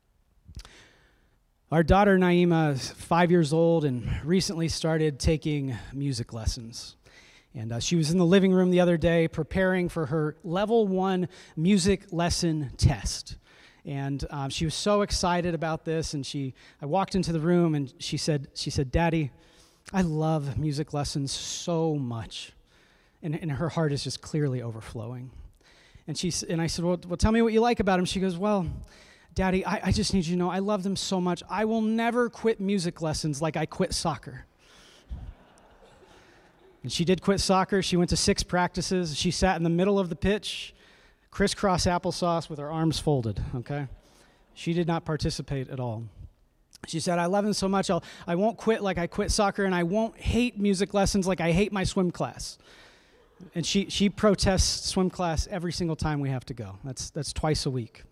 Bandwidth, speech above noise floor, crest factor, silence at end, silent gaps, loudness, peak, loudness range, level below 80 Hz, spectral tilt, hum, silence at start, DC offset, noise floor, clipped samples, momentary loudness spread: 13.5 kHz; 40 dB; 20 dB; 0.05 s; none; -27 LUFS; -8 dBFS; 7 LU; -42 dBFS; -5.5 dB/octave; none; 0.5 s; under 0.1%; -66 dBFS; under 0.1%; 13 LU